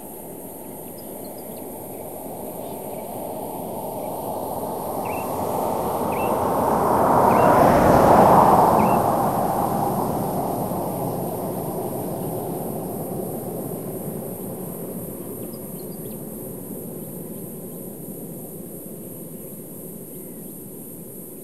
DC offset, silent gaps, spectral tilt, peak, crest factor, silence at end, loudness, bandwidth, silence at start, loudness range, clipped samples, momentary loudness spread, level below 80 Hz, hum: 0.4%; none; -6 dB/octave; -2 dBFS; 20 dB; 0 s; -22 LUFS; 16 kHz; 0 s; 18 LU; under 0.1%; 20 LU; -46 dBFS; none